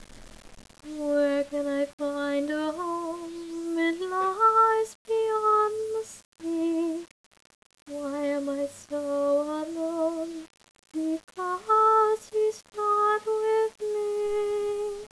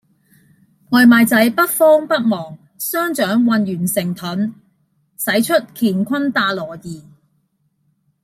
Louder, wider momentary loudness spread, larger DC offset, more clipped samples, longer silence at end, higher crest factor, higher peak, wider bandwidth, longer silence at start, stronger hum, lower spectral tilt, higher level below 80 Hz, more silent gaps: second, -27 LUFS vs -16 LUFS; about the same, 13 LU vs 14 LU; neither; neither; second, 0.05 s vs 1.25 s; about the same, 16 dB vs 16 dB; second, -12 dBFS vs -2 dBFS; second, 11 kHz vs 16 kHz; second, 0 s vs 0.9 s; neither; about the same, -4 dB/octave vs -4.5 dB/octave; about the same, -62 dBFS vs -62 dBFS; first, 1.93-1.98 s, 4.95-5.05 s, 6.25-6.32 s, 7.11-7.31 s, 7.55-7.70 s, 7.82-7.86 s vs none